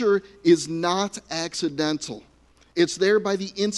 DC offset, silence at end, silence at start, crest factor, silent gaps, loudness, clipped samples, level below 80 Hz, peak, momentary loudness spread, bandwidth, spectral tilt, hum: under 0.1%; 0 s; 0 s; 18 dB; none; -23 LUFS; under 0.1%; -60 dBFS; -6 dBFS; 10 LU; 11.5 kHz; -4 dB/octave; none